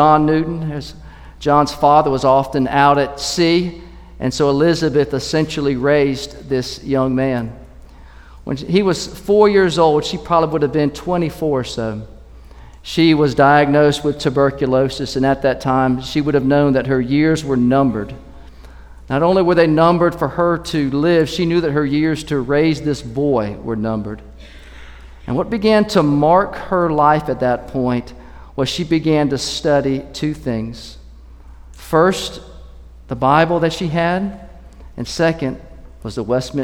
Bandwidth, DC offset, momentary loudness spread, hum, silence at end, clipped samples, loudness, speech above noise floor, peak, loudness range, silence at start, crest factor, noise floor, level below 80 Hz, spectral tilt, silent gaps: 16.5 kHz; under 0.1%; 13 LU; none; 0 s; under 0.1%; -16 LUFS; 24 dB; 0 dBFS; 5 LU; 0 s; 16 dB; -39 dBFS; -38 dBFS; -6 dB/octave; none